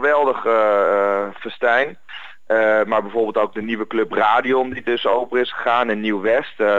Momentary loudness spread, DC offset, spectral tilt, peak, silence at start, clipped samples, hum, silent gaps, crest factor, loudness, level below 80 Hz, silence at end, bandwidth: 7 LU; 1%; -6 dB/octave; -2 dBFS; 0 s; under 0.1%; none; none; 16 dB; -19 LUFS; -66 dBFS; 0 s; 7.6 kHz